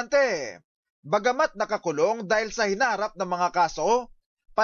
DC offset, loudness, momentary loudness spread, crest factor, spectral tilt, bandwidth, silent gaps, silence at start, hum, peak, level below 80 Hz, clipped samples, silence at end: under 0.1%; -25 LUFS; 6 LU; 14 dB; -3.5 dB/octave; 7.4 kHz; 0.64-0.83 s, 0.90-1.03 s, 4.26-4.37 s; 0 s; none; -12 dBFS; -60 dBFS; under 0.1%; 0 s